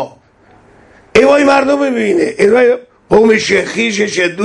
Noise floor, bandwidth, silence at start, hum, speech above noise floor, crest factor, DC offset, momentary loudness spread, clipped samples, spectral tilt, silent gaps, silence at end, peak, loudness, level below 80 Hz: -46 dBFS; 11 kHz; 0 s; none; 36 dB; 12 dB; under 0.1%; 5 LU; under 0.1%; -4.5 dB/octave; none; 0 s; 0 dBFS; -11 LUFS; -46 dBFS